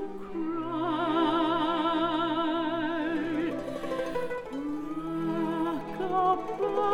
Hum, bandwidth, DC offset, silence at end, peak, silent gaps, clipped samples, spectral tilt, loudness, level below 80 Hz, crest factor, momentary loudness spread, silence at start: none; 10.5 kHz; under 0.1%; 0 s; -14 dBFS; none; under 0.1%; -6.5 dB/octave; -30 LUFS; -54 dBFS; 16 dB; 8 LU; 0 s